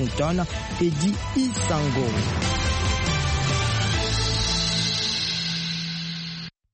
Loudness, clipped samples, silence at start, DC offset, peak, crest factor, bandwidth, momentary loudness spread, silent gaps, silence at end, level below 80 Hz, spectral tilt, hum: -24 LUFS; under 0.1%; 0 s; under 0.1%; -12 dBFS; 14 dB; 8.8 kHz; 7 LU; none; 0.25 s; -34 dBFS; -4 dB/octave; none